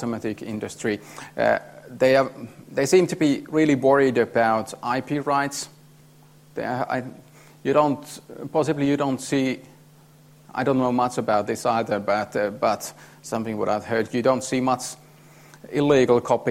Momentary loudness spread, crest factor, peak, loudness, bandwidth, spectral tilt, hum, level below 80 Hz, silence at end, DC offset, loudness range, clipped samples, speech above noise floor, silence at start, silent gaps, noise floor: 13 LU; 18 dB; -6 dBFS; -23 LUFS; 16 kHz; -5.5 dB/octave; none; -62 dBFS; 0 s; under 0.1%; 5 LU; under 0.1%; 29 dB; 0 s; none; -51 dBFS